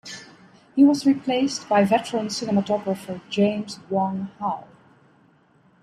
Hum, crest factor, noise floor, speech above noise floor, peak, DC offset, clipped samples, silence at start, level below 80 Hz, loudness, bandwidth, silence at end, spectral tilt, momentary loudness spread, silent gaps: none; 18 dB; -58 dBFS; 37 dB; -6 dBFS; under 0.1%; under 0.1%; 0.05 s; -68 dBFS; -23 LUFS; 13 kHz; 1.2 s; -5.5 dB/octave; 12 LU; none